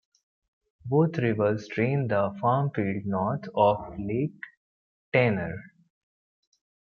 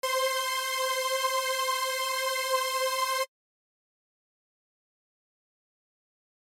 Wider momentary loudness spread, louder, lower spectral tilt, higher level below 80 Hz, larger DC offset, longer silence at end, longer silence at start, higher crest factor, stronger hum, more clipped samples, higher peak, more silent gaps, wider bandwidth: first, 11 LU vs 1 LU; about the same, -27 LUFS vs -28 LUFS; first, -8.5 dB/octave vs 5.5 dB/octave; first, -62 dBFS vs under -90 dBFS; neither; second, 1.25 s vs 3.2 s; first, 0.85 s vs 0.05 s; about the same, 20 dB vs 16 dB; neither; neither; first, -8 dBFS vs -16 dBFS; first, 4.57-5.12 s vs none; second, 6.8 kHz vs 16.5 kHz